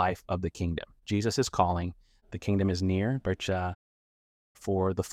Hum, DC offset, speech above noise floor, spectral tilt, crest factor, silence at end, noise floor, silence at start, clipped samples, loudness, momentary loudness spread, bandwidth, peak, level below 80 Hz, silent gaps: none; under 0.1%; over 61 dB; -6 dB/octave; 22 dB; 0 s; under -90 dBFS; 0 s; under 0.1%; -30 LUFS; 10 LU; 14.5 kHz; -8 dBFS; -50 dBFS; 3.75-4.55 s